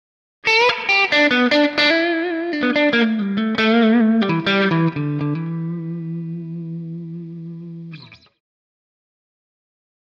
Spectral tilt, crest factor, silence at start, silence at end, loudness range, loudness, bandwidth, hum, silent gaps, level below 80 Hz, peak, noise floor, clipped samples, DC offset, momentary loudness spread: -6 dB/octave; 14 dB; 0.45 s; 1.95 s; 18 LU; -17 LUFS; 7.4 kHz; none; none; -64 dBFS; -6 dBFS; -40 dBFS; under 0.1%; under 0.1%; 18 LU